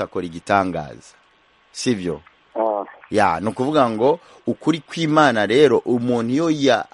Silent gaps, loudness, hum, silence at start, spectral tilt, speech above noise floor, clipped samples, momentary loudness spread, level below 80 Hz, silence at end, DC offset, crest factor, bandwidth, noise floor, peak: none; -19 LUFS; none; 0 s; -5.5 dB/octave; 38 dB; under 0.1%; 13 LU; -56 dBFS; 0.1 s; under 0.1%; 18 dB; 11.5 kHz; -57 dBFS; -2 dBFS